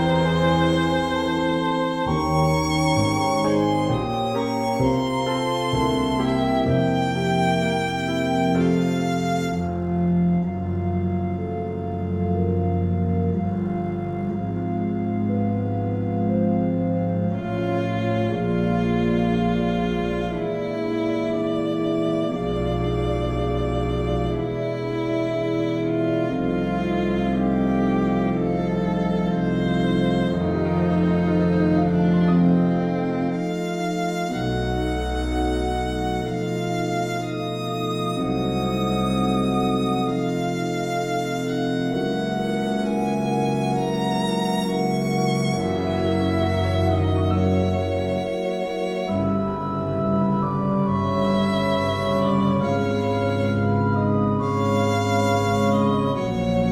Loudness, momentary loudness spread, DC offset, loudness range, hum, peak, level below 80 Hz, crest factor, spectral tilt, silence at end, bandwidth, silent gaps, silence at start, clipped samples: -23 LUFS; 5 LU; under 0.1%; 3 LU; none; -8 dBFS; -40 dBFS; 14 dB; -7 dB/octave; 0 s; 14.5 kHz; none; 0 s; under 0.1%